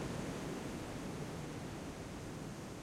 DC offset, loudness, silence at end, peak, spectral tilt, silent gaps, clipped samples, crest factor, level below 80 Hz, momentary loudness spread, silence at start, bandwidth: under 0.1%; -45 LUFS; 0 s; -30 dBFS; -5.5 dB/octave; none; under 0.1%; 14 dB; -58 dBFS; 4 LU; 0 s; 16.5 kHz